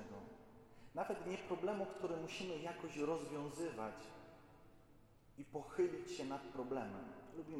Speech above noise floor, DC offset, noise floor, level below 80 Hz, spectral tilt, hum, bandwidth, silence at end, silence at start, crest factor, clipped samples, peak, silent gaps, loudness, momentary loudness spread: 22 dB; under 0.1%; -66 dBFS; -72 dBFS; -5.5 dB/octave; none; 15 kHz; 0 s; 0 s; 18 dB; under 0.1%; -28 dBFS; none; -45 LUFS; 19 LU